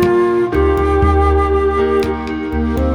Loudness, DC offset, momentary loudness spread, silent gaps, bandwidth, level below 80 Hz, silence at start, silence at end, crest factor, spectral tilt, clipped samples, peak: -15 LUFS; under 0.1%; 6 LU; none; 11 kHz; -20 dBFS; 0 s; 0 s; 12 dB; -8 dB/octave; under 0.1%; -2 dBFS